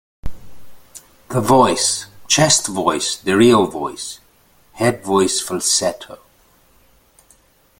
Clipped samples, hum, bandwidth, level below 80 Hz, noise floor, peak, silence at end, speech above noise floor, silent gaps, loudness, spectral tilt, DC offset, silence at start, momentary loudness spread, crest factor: under 0.1%; none; 17 kHz; -44 dBFS; -54 dBFS; 0 dBFS; 1.65 s; 38 dB; none; -16 LUFS; -3.5 dB/octave; under 0.1%; 0.25 s; 22 LU; 18 dB